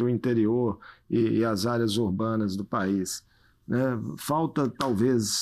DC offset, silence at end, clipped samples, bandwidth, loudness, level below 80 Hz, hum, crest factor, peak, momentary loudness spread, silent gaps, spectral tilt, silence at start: under 0.1%; 0 s; under 0.1%; 15 kHz; -27 LUFS; -60 dBFS; none; 16 dB; -12 dBFS; 7 LU; none; -5.5 dB/octave; 0 s